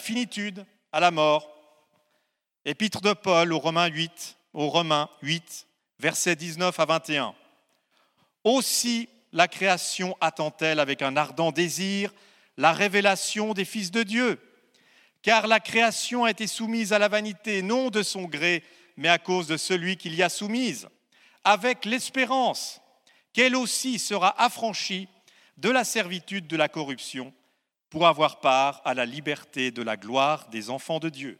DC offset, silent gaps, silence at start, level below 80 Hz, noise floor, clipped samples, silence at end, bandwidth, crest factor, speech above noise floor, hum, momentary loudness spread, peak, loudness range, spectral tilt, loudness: under 0.1%; none; 0 s; -78 dBFS; -76 dBFS; under 0.1%; 0.05 s; 17 kHz; 24 dB; 51 dB; none; 10 LU; -2 dBFS; 3 LU; -3 dB/octave; -25 LUFS